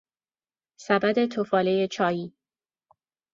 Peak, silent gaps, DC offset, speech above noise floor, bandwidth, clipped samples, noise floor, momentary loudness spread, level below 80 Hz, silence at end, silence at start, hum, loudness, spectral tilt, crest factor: -6 dBFS; none; under 0.1%; over 66 dB; 7.6 kHz; under 0.1%; under -90 dBFS; 13 LU; -70 dBFS; 1.05 s; 0.8 s; none; -25 LUFS; -6 dB/octave; 22 dB